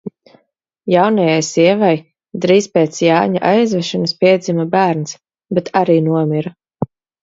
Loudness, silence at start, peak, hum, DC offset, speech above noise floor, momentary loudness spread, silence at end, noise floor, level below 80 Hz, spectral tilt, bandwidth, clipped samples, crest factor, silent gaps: -14 LUFS; 0.05 s; 0 dBFS; none; under 0.1%; 49 dB; 14 LU; 0.35 s; -63 dBFS; -60 dBFS; -5.5 dB/octave; 7.8 kHz; under 0.1%; 14 dB; none